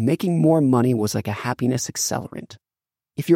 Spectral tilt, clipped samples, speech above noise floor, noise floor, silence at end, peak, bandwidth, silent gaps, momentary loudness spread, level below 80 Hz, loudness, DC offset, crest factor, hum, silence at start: -5.5 dB/octave; under 0.1%; over 69 dB; under -90 dBFS; 0 s; -4 dBFS; 16.5 kHz; none; 16 LU; -64 dBFS; -21 LUFS; under 0.1%; 16 dB; none; 0 s